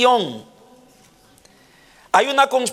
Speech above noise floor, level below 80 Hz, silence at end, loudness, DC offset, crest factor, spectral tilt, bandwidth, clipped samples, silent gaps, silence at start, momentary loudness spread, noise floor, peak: 35 dB; -68 dBFS; 0 s; -18 LUFS; under 0.1%; 20 dB; -2.5 dB/octave; 16 kHz; under 0.1%; none; 0 s; 14 LU; -52 dBFS; -2 dBFS